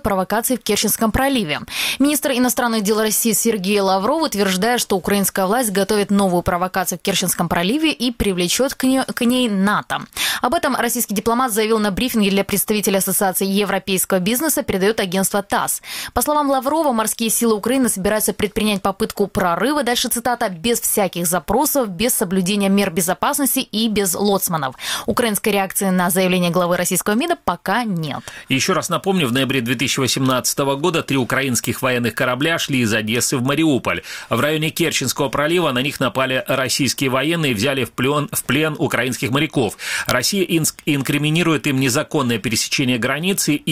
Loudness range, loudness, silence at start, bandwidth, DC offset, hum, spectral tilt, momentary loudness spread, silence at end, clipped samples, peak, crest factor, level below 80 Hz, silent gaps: 1 LU; -18 LUFS; 0.05 s; 17.5 kHz; under 0.1%; none; -3.5 dB/octave; 3 LU; 0 s; under 0.1%; 0 dBFS; 18 dB; -44 dBFS; none